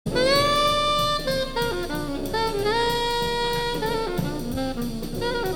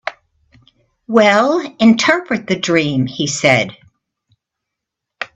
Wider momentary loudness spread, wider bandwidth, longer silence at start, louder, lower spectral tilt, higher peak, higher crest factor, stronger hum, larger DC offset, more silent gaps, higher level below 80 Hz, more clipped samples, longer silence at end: about the same, 9 LU vs 8 LU; first, 19.5 kHz vs 8.4 kHz; about the same, 0.05 s vs 0.05 s; second, -24 LUFS vs -14 LUFS; about the same, -4 dB/octave vs -4.5 dB/octave; second, -8 dBFS vs 0 dBFS; about the same, 14 dB vs 16 dB; neither; neither; neither; first, -36 dBFS vs -56 dBFS; neither; about the same, 0 s vs 0.1 s